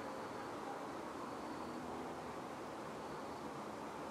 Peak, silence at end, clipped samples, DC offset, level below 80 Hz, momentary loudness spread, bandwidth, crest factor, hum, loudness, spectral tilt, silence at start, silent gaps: -34 dBFS; 0 s; under 0.1%; under 0.1%; -72 dBFS; 1 LU; 15.5 kHz; 12 dB; none; -47 LUFS; -5 dB/octave; 0 s; none